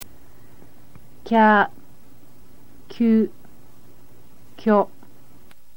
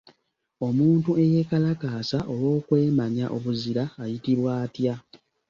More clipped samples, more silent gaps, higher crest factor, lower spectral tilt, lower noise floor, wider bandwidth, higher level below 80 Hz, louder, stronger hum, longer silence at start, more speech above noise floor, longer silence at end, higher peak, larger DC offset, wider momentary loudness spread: neither; neither; about the same, 20 dB vs 16 dB; second, -7 dB/octave vs -8.5 dB/octave; second, -53 dBFS vs -67 dBFS; first, 17 kHz vs 7.2 kHz; about the same, -60 dBFS vs -60 dBFS; first, -19 LUFS vs -25 LUFS; neither; second, 0 s vs 0.6 s; second, 36 dB vs 43 dB; first, 0.9 s vs 0.35 s; first, -4 dBFS vs -8 dBFS; first, 2% vs under 0.1%; first, 14 LU vs 8 LU